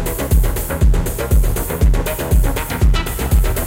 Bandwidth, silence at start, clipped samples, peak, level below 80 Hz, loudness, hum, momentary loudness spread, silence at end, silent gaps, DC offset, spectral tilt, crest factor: 17 kHz; 0 s; under 0.1%; -2 dBFS; -16 dBFS; -18 LUFS; none; 3 LU; 0 s; none; under 0.1%; -5.5 dB/octave; 12 dB